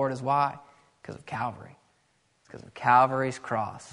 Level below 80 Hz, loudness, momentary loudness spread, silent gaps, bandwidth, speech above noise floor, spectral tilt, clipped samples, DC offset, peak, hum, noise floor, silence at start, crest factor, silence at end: -66 dBFS; -26 LUFS; 26 LU; none; 10.5 kHz; 42 dB; -6 dB/octave; under 0.1%; under 0.1%; -8 dBFS; none; -69 dBFS; 0 s; 22 dB; 0 s